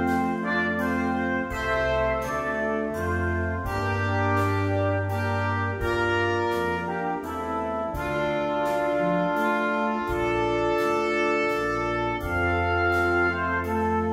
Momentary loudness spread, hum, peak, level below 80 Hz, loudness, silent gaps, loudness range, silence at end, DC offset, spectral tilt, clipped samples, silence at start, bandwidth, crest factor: 4 LU; none; -10 dBFS; -42 dBFS; -25 LUFS; none; 2 LU; 0 s; under 0.1%; -6.5 dB/octave; under 0.1%; 0 s; 16 kHz; 14 dB